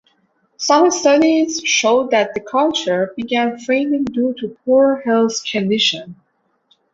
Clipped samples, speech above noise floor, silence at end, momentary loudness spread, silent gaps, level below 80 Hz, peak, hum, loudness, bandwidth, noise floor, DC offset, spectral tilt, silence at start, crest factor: under 0.1%; 46 dB; 0.8 s; 7 LU; none; -60 dBFS; -2 dBFS; none; -16 LUFS; 8 kHz; -62 dBFS; under 0.1%; -3 dB/octave; 0.6 s; 16 dB